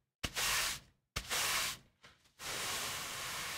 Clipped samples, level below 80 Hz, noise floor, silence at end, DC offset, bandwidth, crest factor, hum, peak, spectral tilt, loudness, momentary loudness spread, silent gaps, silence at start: under 0.1%; -58 dBFS; -65 dBFS; 0 s; under 0.1%; 16 kHz; 20 dB; none; -20 dBFS; 0 dB/octave; -37 LUFS; 13 LU; none; 0.25 s